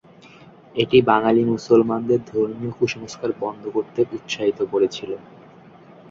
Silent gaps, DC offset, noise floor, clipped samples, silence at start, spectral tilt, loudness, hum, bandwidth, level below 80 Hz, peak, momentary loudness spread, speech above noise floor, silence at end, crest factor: none; under 0.1%; -46 dBFS; under 0.1%; 0.75 s; -6 dB/octave; -21 LUFS; none; 7.6 kHz; -60 dBFS; 0 dBFS; 11 LU; 26 dB; 0.9 s; 20 dB